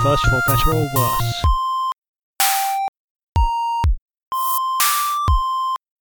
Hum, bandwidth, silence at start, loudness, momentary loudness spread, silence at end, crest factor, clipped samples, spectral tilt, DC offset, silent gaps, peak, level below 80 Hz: none; 19.5 kHz; 0 s; -19 LUFS; 9 LU; 0.3 s; 16 dB; under 0.1%; -4 dB/octave; under 0.1%; 1.98-2.02 s, 2.08-2.13 s, 2.23-2.34 s, 2.88-2.93 s, 3.00-3.15 s, 3.23-3.33 s, 4.01-4.06 s, 4.27-4.31 s; -2 dBFS; -26 dBFS